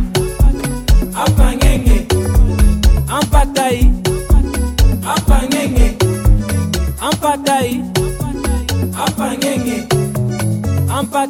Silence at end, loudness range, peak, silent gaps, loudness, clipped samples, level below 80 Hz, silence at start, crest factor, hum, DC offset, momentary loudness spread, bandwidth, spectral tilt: 0 s; 3 LU; 0 dBFS; none; -15 LUFS; under 0.1%; -16 dBFS; 0 s; 12 dB; none; under 0.1%; 5 LU; 17 kHz; -5.5 dB/octave